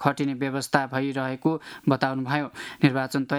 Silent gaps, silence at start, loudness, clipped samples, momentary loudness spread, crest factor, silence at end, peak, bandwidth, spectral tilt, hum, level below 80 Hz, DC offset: none; 0 s; -26 LUFS; under 0.1%; 5 LU; 22 dB; 0 s; -2 dBFS; 14.5 kHz; -6 dB/octave; none; -68 dBFS; under 0.1%